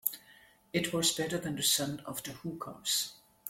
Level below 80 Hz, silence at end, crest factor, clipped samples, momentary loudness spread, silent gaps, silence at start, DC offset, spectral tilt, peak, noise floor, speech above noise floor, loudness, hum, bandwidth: -68 dBFS; 0 s; 22 dB; under 0.1%; 13 LU; none; 0.05 s; under 0.1%; -2.5 dB/octave; -12 dBFS; -61 dBFS; 27 dB; -32 LUFS; none; 16.5 kHz